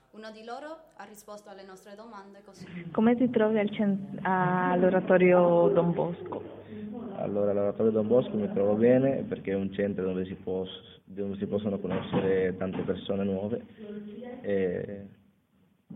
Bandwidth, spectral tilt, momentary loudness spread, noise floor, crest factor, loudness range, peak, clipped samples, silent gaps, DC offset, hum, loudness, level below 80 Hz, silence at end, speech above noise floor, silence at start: 9 kHz; -8.5 dB/octave; 23 LU; -67 dBFS; 20 dB; 7 LU; -10 dBFS; under 0.1%; none; under 0.1%; none; -27 LUFS; -64 dBFS; 0 s; 39 dB; 0.15 s